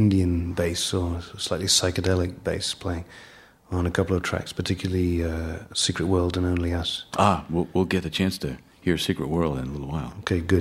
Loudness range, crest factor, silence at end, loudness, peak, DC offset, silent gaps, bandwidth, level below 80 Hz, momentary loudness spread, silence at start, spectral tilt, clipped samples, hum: 3 LU; 22 dB; 0 s; -25 LUFS; -2 dBFS; under 0.1%; none; 15 kHz; -42 dBFS; 9 LU; 0 s; -4.5 dB/octave; under 0.1%; none